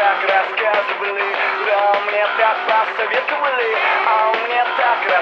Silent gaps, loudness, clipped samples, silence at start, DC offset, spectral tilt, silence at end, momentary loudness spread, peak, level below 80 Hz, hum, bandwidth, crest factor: none; -16 LUFS; under 0.1%; 0 s; under 0.1%; -2.5 dB/octave; 0 s; 3 LU; -2 dBFS; under -90 dBFS; none; 7.2 kHz; 16 dB